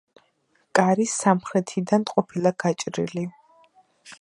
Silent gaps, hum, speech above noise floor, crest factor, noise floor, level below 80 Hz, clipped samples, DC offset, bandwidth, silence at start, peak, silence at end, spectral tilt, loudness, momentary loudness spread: none; none; 44 dB; 22 dB; -67 dBFS; -70 dBFS; under 0.1%; under 0.1%; 11.5 kHz; 0.75 s; -2 dBFS; 0.05 s; -5 dB/octave; -23 LUFS; 8 LU